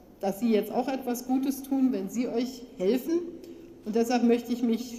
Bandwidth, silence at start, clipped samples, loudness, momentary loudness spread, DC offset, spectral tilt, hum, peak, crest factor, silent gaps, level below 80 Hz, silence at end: 15.5 kHz; 0.2 s; under 0.1%; -28 LUFS; 10 LU; under 0.1%; -5.5 dB/octave; none; -12 dBFS; 16 dB; none; -64 dBFS; 0 s